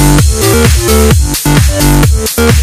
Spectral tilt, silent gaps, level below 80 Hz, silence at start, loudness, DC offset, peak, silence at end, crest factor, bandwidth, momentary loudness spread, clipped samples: -4.5 dB/octave; none; -12 dBFS; 0 s; -8 LUFS; under 0.1%; 0 dBFS; 0 s; 6 dB; 16 kHz; 2 LU; 1%